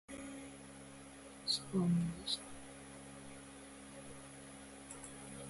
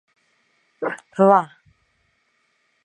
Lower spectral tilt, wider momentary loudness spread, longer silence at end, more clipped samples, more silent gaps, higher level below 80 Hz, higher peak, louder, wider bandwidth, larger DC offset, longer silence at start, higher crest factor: second, -4.5 dB/octave vs -8 dB/octave; first, 18 LU vs 15 LU; second, 0 s vs 1.4 s; neither; neither; first, -66 dBFS vs -74 dBFS; second, -24 dBFS vs -2 dBFS; second, -42 LUFS vs -19 LUFS; about the same, 11.5 kHz vs 10.5 kHz; neither; second, 0.1 s vs 0.8 s; about the same, 20 dB vs 22 dB